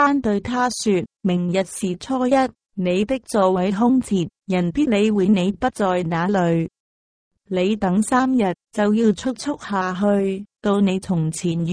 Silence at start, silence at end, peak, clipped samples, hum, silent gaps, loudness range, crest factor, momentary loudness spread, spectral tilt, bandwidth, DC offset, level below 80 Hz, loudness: 0 s; 0 s; -4 dBFS; under 0.1%; none; 6.80-7.31 s; 2 LU; 16 dB; 6 LU; -6 dB/octave; 10.5 kHz; under 0.1%; -50 dBFS; -20 LUFS